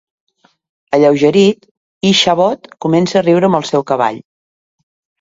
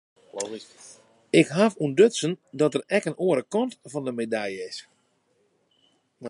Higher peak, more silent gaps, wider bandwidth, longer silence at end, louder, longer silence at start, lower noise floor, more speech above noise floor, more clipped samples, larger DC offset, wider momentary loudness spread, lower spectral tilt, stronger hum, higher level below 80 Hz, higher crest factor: first, 0 dBFS vs -4 dBFS; first, 1.71-2.01 s vs none; second, 7.8 kHz vs 11.5 kHz; first, 1.05 s vs 0 s; first, -13 LUFS vs -25 LUFS; first, 0.9 s vs 0.35 s; first, under -90 dBFS vs -68 dBFS; first, over 78 dB vs 44 dB; neither; neither; second, 8 LU vs 16 LU; about the same, -5 dB/octave vs -5 dB/octave; neither; first, -56 dBFS vs -76 dBFS; second, 14 dB vs 22 dB